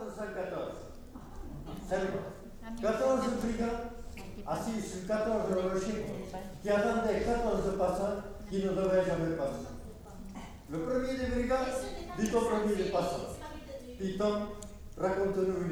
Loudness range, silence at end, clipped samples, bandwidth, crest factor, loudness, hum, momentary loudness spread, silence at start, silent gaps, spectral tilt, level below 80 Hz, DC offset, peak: 3 LU; 0 s; under 0.1%; over 20 kHz; 16 dB; -33 LUFS; none; 17 LU; 0 s; none; -6 dB/octave; -48 dBFS; under 0.1%; -18 dBFS